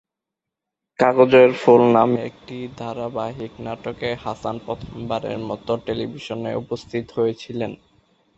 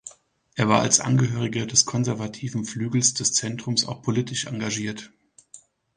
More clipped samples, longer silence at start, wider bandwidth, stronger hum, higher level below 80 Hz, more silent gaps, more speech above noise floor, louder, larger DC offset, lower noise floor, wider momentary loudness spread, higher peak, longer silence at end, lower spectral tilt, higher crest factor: neither; first, 1 s vs 0.05 s; second, 8 kHz vs 10.5 kHz; neither; first, -54 dBFS vs -60 dBFS; neither; first, 65 dB vs 29 dB; about the same, -21 LUFS vs -23 LUFS; neither; first, -85 dBFS vs -52 dBFS; first, 18 LU vs 11 LU; about the same, -2 dBFS vs -2 dBFS; first, 0.65 s vs 0.4 s; first, -7 dB/octave vs -3.5 dB/octave; about the same, 20 dB vs 22 dB